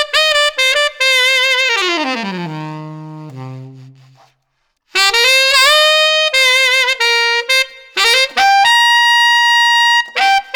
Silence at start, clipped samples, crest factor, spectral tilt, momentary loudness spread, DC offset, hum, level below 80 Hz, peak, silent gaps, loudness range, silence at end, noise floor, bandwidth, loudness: 0 s; under 0.1%; 12 dB; -1 dB/octave; 18 LU; under 0.1%; none; -56 dBFS; -2 dBFS; none; 9 LU; 0 s; -66 dBFS; over 20 kHz; -10 LUFS